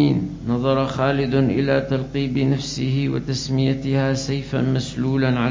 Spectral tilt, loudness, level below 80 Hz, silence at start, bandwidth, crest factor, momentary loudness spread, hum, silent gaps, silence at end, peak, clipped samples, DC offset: -6.5 dB/octave; -21 LUFS; -42 dBFS; 0 s; 7.6 kHz; 16 dB; 5 LU; none; none; 0 s; -6 dBFS; under 0.1%; under 0.1%